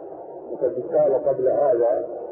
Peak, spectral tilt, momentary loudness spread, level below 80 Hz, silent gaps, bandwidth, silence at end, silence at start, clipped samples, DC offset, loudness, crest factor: -10 dBFS; -12.5 dB/octave; 16 LU; -64 dBFS; none; 2.4 kHz; 0 s; 0 s; under 0.1%; under 0.1%; -21 LUFS; 12 dB